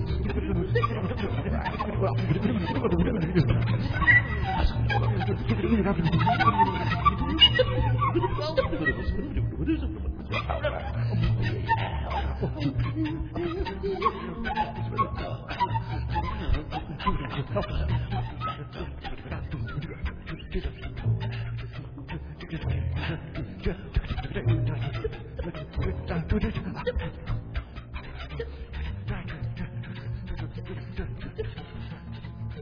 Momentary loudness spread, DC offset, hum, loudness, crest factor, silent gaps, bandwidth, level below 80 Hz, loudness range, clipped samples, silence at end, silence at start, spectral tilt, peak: 13 LU; under 0.1%; none; -28 LUFS; 20 dB; none; 5.2 kHz; -36 dBFS; 12 LU; under 0.1%; 0 s; 0 s; -8 dB/octave; -8 dBFS